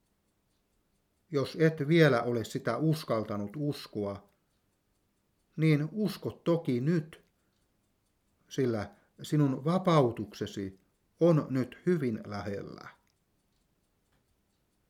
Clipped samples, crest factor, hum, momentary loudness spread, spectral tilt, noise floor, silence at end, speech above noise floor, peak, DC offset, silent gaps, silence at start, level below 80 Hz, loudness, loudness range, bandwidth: under 0.1%; 22 dB; none; 15 LU; -7.5 dB/octave; -75 dBFS; 2 s; 46 dB; -10 dBFS; under 0.1%; none; 1.3 s; -72 dBFS; -30 LUFS; 5 LU; 15 kHz